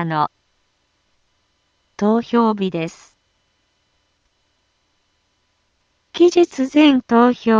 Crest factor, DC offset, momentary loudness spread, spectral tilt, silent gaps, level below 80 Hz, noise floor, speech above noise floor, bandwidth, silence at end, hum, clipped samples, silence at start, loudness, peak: 18 dB; under 0.1%; 11 LU; -6 dB/octave; none; -62 dBFS; -66 dBFS; 51 dB; 7.6 kHz; 0 s; none; under 0.1%; 0 s; -16 LUFS; -2 dBFS